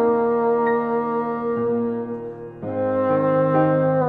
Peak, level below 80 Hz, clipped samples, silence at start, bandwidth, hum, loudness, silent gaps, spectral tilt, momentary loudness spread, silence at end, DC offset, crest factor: -6 dBFS; -58 dBFS; under 0.1%; 0 s; 4.2 kHz; none; -21 LUFS; none; -11 dB/octave; 11 LU; 0 s; under 0.1%; 14 dB